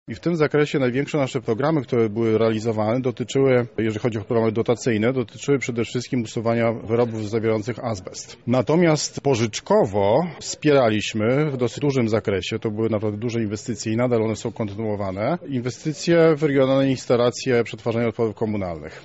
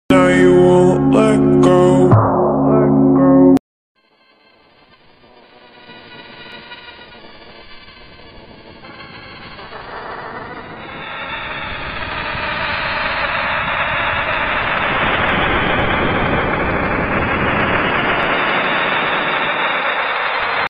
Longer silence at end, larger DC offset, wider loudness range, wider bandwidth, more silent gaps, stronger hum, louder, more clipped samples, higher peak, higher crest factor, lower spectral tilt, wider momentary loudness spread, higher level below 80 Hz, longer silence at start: about the same, 0.05 s vs 0 s; neither; second, 3 LU vs 24 LU; second, 8 kHz vs 10 kHz; second, none vs 3.60-3.95 s; neither; second, -22 LUFS vs -14 LUFS; neither; second, -6 dBFS vs 0 dBFS; about the same, 14 dB vs 16 dB; about the same, -6 dB/octave vs -6.5 dB/octave; second, 8 LU vs 22 LU; second, -56 dBFS vs -36 dBFS; about the same, 0.1 s vs 0.1 s